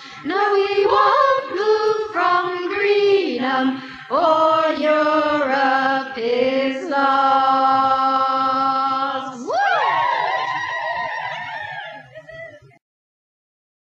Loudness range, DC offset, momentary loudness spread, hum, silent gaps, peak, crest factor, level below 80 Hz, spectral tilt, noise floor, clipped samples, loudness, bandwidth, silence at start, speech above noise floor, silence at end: 6 LU; under 0.1%; 11 LU; none; none; -4 dBFS; 16 dB; -62 dBFS; -4.5 dB/octave; -39 dBFS; under 0.1%; -18 LUFS; 7.8 kHz; 0 s; 22 dB; 1.35 s